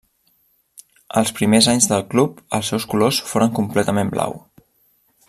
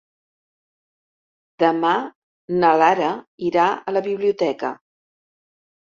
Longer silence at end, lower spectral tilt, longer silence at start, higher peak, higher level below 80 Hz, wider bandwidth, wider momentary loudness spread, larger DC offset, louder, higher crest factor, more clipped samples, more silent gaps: second, 0.9 s vs 1.2 s; second, -4 dB/octave vs -6 dB/octave; second, 1.15 s vs 1.6 s; about the same, 0 dBFS vs -2 dBFS; first, -54 dBFS vs -68 dBFS; first, 15 kHz vs 7.4 kHz; about the same, 10 LU vs 12 LU; neither; about the same, -18 LUFS vs -20 LUFS; about the same, 20 dB vs 20 dB; neither; second, none vs 2.15-2.48 s, 3.27-3.38 s